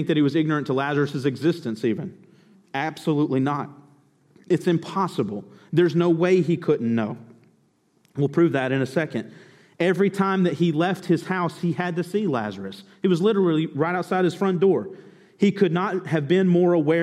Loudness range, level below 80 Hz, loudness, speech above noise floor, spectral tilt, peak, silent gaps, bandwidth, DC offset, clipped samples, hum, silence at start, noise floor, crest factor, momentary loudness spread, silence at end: 4 LU; -72 dBFS; -23 LUFS; 42 dB; -7.5 dB/octave; -6 dBFS; none; 12.5 kHz; under 0.1%; under 0.1%; none; 0 s; -64 dBFS; 16 dB; 10 LU; 0 s